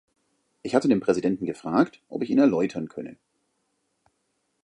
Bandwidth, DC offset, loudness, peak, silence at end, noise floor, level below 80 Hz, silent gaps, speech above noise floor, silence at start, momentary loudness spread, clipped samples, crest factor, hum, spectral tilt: 10 kHz; under 0.1%; -24 LUFS; -4 dBFS; 1.5 s; -74 dBFS; -66 dBFS; none; 51 dB; 0.65 s; 16 LU; under 0.1%; 22 dB; none; -7 dB/octave